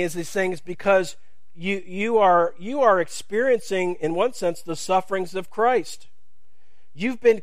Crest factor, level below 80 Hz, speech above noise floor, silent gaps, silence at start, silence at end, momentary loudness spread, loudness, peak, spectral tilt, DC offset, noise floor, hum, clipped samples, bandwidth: 18 dB; -64 dBFS; 48 dB; none; 0 s; 0 s; 10 LU; -23 LUFS; -4 dBFS; -4.5 dB/octave; 2%; -70 dBFS; none; under 0.1%; 15.5 kHz